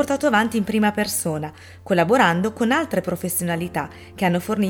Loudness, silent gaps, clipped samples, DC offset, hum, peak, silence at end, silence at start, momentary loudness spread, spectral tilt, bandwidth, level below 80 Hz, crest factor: -21 LUFS; none; under 0.1%; under 0.1%; none; -4 dBFS; 0 s; 0 s; 10 LU; -5 dB/octave; 19 kHz; -54 dBFS; 18 dB